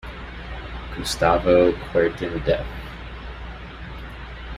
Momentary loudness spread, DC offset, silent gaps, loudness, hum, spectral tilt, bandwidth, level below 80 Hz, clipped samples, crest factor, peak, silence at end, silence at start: 19 LU; under 0.1%; none; -21 LUFS; none; -5.5 dB/octave; 15 kHz; -36 dBFS; under 0.1%; 20 dB; -4 dBFS; 0 s; 0 s